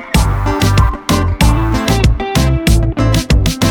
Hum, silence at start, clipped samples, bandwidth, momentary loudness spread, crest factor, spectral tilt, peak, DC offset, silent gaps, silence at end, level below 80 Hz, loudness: none; 0 s; under 0.1%; 19.5 kHz; 2 LU; 12 dB; -5.5 dB/octave; 0 dBFS; under 0.1%; none; 0 s; -16 dBFS; -13 LUFS